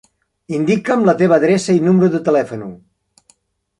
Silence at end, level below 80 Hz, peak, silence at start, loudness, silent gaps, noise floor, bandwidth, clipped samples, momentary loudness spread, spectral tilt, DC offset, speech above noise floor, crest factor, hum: 1.05 s; -58 dBFS; -2 dBFS; 0.5 s; -15 LUFS; none; -57 dBFS; 11.5 kHz; under 0.1%; 13 LU; -7 dB/octave; under 0.1%; 43 dB; 14 dB; none